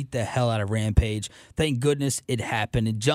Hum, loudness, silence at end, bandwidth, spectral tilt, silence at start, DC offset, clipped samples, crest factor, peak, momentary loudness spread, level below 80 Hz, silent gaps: none; -25 LUFS; 0 s; 15.5 kHz; -5 dB/octave; 0 s; under 0.1%; under 0.1%; 20 dB; -6 dBFS; 5 LU; -36 dBFS; none